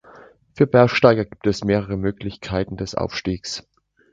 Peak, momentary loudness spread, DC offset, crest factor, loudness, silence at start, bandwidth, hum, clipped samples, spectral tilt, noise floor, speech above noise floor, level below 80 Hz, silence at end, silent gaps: 0 dBFS; 13 LU; under 0.1%; 20 dB; -20 LUFS; 0.55 s; 9 kHz; none; under 0.1%; -6 dB/octave; -47 dBFS; 28 dB; -44 dBFS; 0.5 s; none